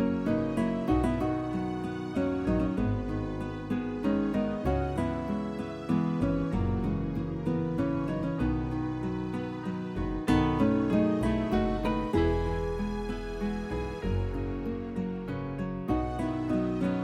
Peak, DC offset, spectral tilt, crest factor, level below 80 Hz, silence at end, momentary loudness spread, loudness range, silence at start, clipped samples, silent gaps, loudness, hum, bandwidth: -12 dBFS; under 0.1%; -8.5 dB/octave; 16 dB; -40 dBFS; 0 s; 8 LU; 4 LU; 0 s; under 0.1%; none; -30 LUFS; none; 12.5 kHz